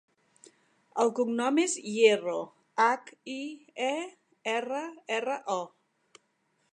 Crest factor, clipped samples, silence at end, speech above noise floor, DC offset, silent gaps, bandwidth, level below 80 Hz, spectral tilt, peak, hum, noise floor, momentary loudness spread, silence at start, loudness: 22 dB; under 0.1%; 1.05 s; 45 dB; under 0.1%; none; 11 kHz; -88 dBFS; -3 dB/octave; -8 dBFS; none; -74 dBFS; 15 LU; 0.95 s; -29 LUFS